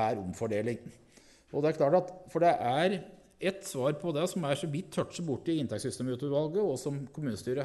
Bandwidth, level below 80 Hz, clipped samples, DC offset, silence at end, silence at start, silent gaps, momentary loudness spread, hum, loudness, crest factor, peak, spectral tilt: 12 kHz; -68 dBFS; under 0.1%; under 0.1%; 0 s; 0 s; none; 9 LU; none; -32 LUFS; 18 dB; -14 dBFS; -6 dB/octave